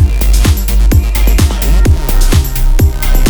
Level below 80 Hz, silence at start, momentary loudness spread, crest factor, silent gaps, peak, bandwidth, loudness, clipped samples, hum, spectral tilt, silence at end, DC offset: -8 dBFS; 0 s; 2 LU; 8 dB; none; 0 dBFS; over 20 kHz; -11 LUFS; 0.3%; none; -5 dB/octave; 0 s; 0.6%